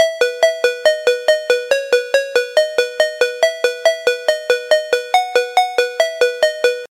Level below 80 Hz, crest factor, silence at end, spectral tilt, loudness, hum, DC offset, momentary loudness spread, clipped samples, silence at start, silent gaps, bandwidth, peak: -70 dBFS; 16 dB; 0.05 s; 1 dB/octave; -16 LUFS; none; under 0.1%; 2 LU; under 0.1%; 0 s; none; 16.5 kHz; 0 dBFS